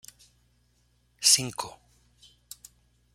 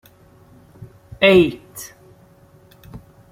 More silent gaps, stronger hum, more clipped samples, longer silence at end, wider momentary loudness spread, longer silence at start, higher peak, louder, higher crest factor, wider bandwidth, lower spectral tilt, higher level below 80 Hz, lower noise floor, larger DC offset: neither; first, 60 Hz at -60 dBFS vs none; neither; first, 1.45 s vs 0.35 s; first, 27 LU vs 23 LU; first, 1.2 s vs 0.8 s; second, -6 dBFS vs 0 dBFS; second, -23 LUFS vs -15 LUFS; about the same, 26 dB vs 22 dB; about the same, 16.5 kHz vs 16 kHz; second, 0 dB/octave vs -5.5 dB/octave; second, -66 dBFS vs -50 dBFS; first, -68 dBFS vs -50 dBFS; neither